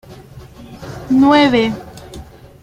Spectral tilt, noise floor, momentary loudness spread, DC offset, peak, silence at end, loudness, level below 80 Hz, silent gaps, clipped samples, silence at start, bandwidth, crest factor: -6 dB/octave; -37 dBFS; 25 LU; under 0.1%; -2 dBFS; 0.4 s; -13 LUFS; -42 dBFS; none; under 0.1%; 0.1 s; 11.5 kHz; 16 dB